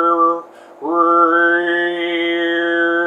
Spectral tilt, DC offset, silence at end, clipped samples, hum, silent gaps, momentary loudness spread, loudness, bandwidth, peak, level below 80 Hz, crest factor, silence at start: -5 dB/octave; under 0.1%; 0 s; under 0.1%; none; none; 8 LU; -15 LUFS; 4 kHz; -2 dBFS; -84 dBFS; 14 dB; 0 s